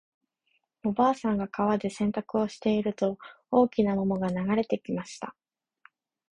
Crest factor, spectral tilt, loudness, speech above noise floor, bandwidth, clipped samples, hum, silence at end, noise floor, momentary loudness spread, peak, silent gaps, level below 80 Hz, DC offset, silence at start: 18 dB; -7 dB/octave; -28 LUFS; 48 dB; 10.5 kHz; under 0.1%; none; 1 s; -75 dBFS; 10 LU; -10 dBFS; none; -60 dBFS; under 0.1%; 0.85 s